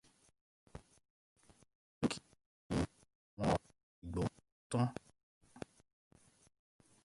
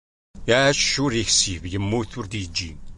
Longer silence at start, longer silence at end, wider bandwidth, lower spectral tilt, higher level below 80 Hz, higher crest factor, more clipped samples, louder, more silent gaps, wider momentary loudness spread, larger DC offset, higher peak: first, 0.75 s vs 0.35 s; first, 1.45 s vs 0 s; about the same, 11.5 kHz vs 11.5 kHz; first, -6.5 dB/octave vs -3 dB/octave; second, -60 dBFS vs -40 dBFS; about the same, 24 dB vs 20 dB; neither; second, -40 LUFS vs -21 LUFS; first, 1.10-1.36 s, 1.75-2.01 s, 2.46-2.70 s, 3.15-3.37 s, 3.83-4.02 s, 4.52-4.70 s, 5.23-5.41 s vs none; first, 22 LU vs 12 LU; neither; second, -20 dBFS vs -4 dBFS